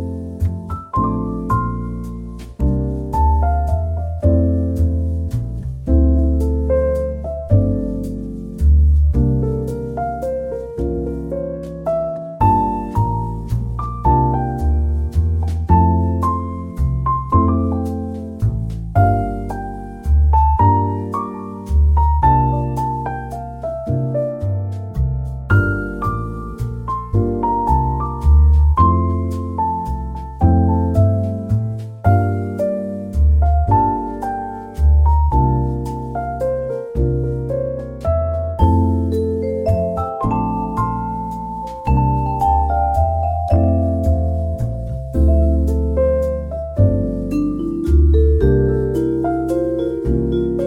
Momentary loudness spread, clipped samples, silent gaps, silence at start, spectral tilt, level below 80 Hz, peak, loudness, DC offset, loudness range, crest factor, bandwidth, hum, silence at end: 11 LU; under 0.1%; none; 0 s; -10 dB/octave; -20 dBFS; -2 dBFS; -18 LUFS; under 0.1%; 4 LU; 14 dB; 3.6 kHz; none; 0 s